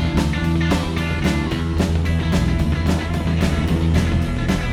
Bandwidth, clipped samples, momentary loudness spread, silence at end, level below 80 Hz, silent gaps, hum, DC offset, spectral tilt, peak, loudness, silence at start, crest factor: 14.5 kHz; under 0.1%; 3 LU; 0 s; -26 dBFS; none; none; under 0.1%; -6.5 dB/octave; -2 dBFS; -20 LUFS; 0 s; 16 dB